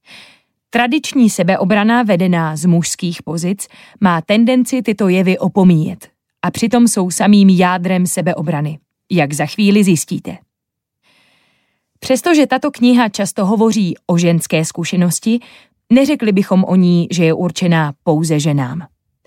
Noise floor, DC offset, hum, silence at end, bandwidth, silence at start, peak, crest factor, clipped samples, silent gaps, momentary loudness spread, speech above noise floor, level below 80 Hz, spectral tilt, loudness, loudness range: -79 dBFS; under 0.1%; none; 0.4 s; 16 kHz; 0.1 s; -2 dBFS; 12 dB; under 0.1%; none; 9 LU; 66 dB; -58 dBFS; -5.5 dB/octave; -14 LUFS; 4 LU